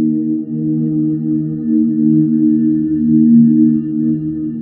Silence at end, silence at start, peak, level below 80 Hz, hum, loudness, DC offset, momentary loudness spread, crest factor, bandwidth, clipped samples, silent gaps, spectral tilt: 0 s; 0 s; -2 dBFS; -50 dBFS; none; -14 LUFS; under 0.1%; 9 LU; 12 dB; 1.9 kHz; under 0.1%; none; -15 dB/octave